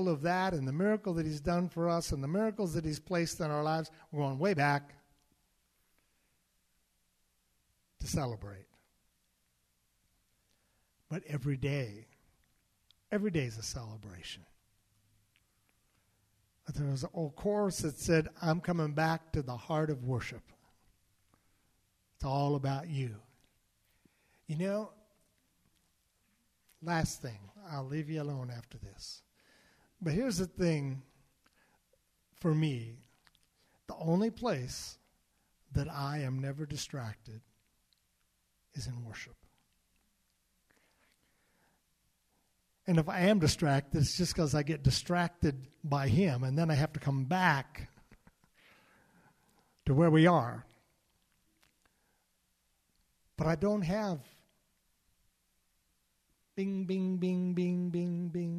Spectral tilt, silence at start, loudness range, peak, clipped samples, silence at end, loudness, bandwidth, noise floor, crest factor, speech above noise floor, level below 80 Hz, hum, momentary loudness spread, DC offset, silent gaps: -6 dB/octave; 0 s; 13 LU; -14 dBFS; under 0.1%; 0 s; -33 LUFS; 15 kHz; -77 dBFS; 22 dB; 44 dB; -56 dBFS; none; 17 LU; under 0.1%; none